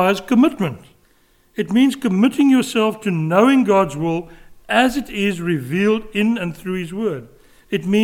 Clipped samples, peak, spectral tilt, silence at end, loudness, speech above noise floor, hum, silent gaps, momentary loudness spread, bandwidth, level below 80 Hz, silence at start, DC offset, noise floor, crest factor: under 0.1%; -2 dBFS; -6 dB/octave; 0 s; -18 LUFS; 39 dB; none; none; 11 LU; 17 kHz; -50 dBFS; 0 s; under 0.1%; -56 dBFS; 16 dB